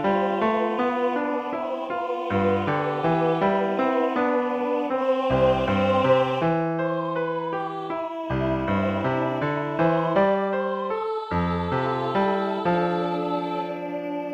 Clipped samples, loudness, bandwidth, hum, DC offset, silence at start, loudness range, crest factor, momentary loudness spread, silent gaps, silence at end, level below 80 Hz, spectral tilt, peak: under 0.1%; -24 LUFS; 7.8 kHz; none; under 0.1%; 0 s; 3 LU; 16 dB; 8 LU; none; 0 s; -50 dBFS; -8 dB/octave; -8 dBFS